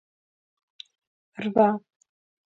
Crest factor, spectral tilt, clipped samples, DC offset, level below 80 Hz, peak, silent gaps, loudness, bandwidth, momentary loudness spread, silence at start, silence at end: 24 dB; -8 dB/octave; under 0.1%; under 0.1%; -74 dBFS; -6 dBFS; none; -24 LUFS; 7.4 kHz; 25 LU; 1.4 s; 0.75 s